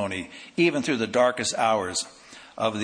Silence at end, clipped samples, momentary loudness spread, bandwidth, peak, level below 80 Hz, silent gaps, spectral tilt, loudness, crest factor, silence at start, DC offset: 0 s; under 0.1%; 12 LU; 10.5 kHz; -8 dBFS; -64 dBFS; none; -3.5 dB/octave; -25 LUFS; 18 dB; 0 s; under 0.1%